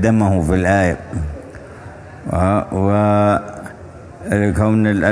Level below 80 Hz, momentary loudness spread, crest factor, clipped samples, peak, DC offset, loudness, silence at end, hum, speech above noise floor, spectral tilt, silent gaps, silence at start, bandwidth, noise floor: -34 dBFS; 21 LU; 16 dB; under 0.1%; 0 dBFS; under 0.1%; -16 LUFS; 0 s; none; 21 dB; -8 dB/octave; none; 0 s; 11 kHz; -36 dBFS